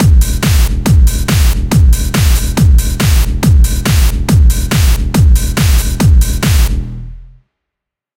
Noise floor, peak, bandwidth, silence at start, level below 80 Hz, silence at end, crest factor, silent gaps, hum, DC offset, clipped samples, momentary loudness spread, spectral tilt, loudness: -80 dBFS; 0 dBFS; 17 kHz; 0 s; -10 dBFS; 0.95 s; 10 dB; none; none; under 0.1%; under 0.1%; 2 LU; -5 dB/octave; -11 LUFS